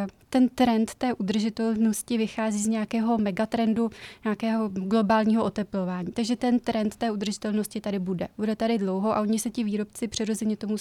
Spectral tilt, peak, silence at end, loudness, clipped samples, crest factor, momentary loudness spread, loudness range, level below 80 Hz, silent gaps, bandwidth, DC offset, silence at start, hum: -5.5 dB/octave; -10 dBFS; 0 s; -26 LUFS; under 0.1%; 16 dB; 7 LU; 2 LU; -58 dBFS; none; 14 kHz; under 0.1%; 0 s; none